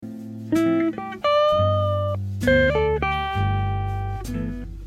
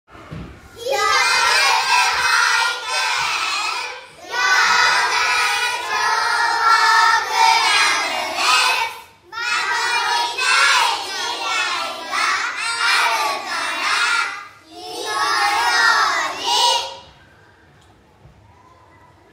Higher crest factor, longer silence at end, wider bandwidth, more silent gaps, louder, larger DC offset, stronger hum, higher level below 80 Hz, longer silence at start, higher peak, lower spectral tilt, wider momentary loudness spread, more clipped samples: about the same, 16 dB vs 18 dB; second, 0 s vs 2.3 s; second, 13.5 kHz vs 16 kHz; neither; second, -22 LUFS vs -16 LUFS; neither; neither; first, -36 dBFS vs -56 dBFS; second, 0 s vs 0.15 s; second, -6 dBFS vs -2 dBFS; first, -7 dB/octave vs 1 dB/octave; about the same, 11 LU vs 12 LU; neither